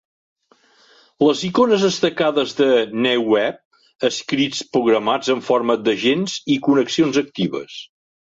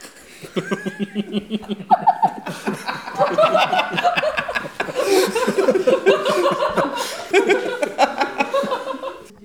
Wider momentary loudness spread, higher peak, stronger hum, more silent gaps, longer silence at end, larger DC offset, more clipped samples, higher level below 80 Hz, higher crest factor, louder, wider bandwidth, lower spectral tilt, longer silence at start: second, 7 LU vs 11 LU; about the same, -4 dBFS vs -2 dBFS; neither; first, 3.65-3.71 s vs none; first, 0.4 s vs 0.15 s; second, under 0.1% vs 0.1%; neither; about the same, -62 dBFS vs -58 dBFS; about the same, 16 dB vs 18 dB; about the same, -18 LUFS vs -20 LUFS; second, 8 kHz vs 19 kHz; about the same, -4.5 dB/octave vs -4 dB/octave; first, 1.2 s vs 0 s